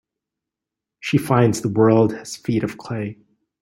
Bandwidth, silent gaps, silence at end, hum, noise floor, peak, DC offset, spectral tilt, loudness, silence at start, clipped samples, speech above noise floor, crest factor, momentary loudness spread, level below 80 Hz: 16 kHz; none; 0.5 s; none; -86 dBFS; -2 dBFS; under 0.1%; -6.5 dB/octave; -20 LUFS; 1.05 s; under 0.1%; 67 dB; 18 dB; 13 LU; -56 dBFS